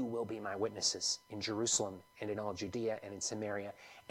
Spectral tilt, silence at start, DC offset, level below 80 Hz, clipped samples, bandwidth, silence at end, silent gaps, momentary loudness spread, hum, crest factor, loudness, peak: -2.5 dB/octave; 0 s; under 0.1%; -74 dBFS; under 0.1%; 16.5 kHz; 0.1 s; none; 10 LU; none; 20 dB; -37 LUFS; -18 dBFS